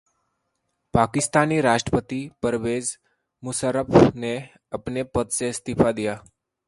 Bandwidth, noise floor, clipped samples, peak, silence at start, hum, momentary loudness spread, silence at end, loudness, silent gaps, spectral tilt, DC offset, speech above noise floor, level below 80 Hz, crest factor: 11.5 kHz; -75 dBFS; under 0.1%; 0 dBFS; 0.95 s; none; 14 LU; 0.5 s; -23 LUFS; none; -5 dB/octave; under 0.1%; 54 dB; -46 dBFS; 22 dB